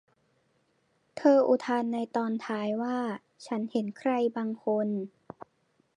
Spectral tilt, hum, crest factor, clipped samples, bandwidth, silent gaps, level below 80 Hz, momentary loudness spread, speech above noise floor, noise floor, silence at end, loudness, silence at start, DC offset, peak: -6.5 dB/octave; none; 20 dB; under 0.1%; 10.5 kHz; none; -80 dBFS; 19 LU; 44 dB; -72 dBFS; 0.9 s; -29 LUFS; 1.15 s; under 0.1%; -10 dBFS